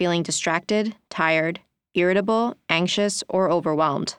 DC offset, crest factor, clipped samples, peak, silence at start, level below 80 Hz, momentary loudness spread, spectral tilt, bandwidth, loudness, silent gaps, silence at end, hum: under 0.1%; 18 dB; under 0.1%; -4 dBFS; 0 s; -68 dBFS; 5 LU; -4 dB/octave; 12.5 kHz; -22 LUFS; none; 0.05 s; none